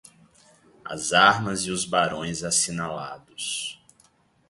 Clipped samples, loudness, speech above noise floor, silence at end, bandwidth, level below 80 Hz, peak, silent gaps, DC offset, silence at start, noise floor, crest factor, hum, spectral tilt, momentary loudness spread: under 0.1%; -23 LUFS; 37 dB; 0.75 s; 12 kHz; -58 dBFS; -2 dBFS; none; under 0.1%; 0.85 s; -61 dBFS; 24 dB; none; -2 dB/octave; 17 LU